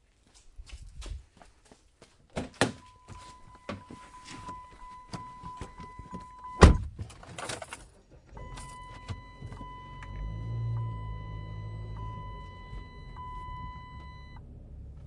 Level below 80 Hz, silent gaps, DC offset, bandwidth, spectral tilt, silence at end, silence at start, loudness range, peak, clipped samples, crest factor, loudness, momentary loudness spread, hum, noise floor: -38 dBFS; none; under 0.1%; 11.5 kHz; -6 dB/octave; 0 s; 0.35 s; 14 LU; 0 dBFS; under 0.1%; 34 dB; -34 LUFS; 18 LU; none; -60 dBFS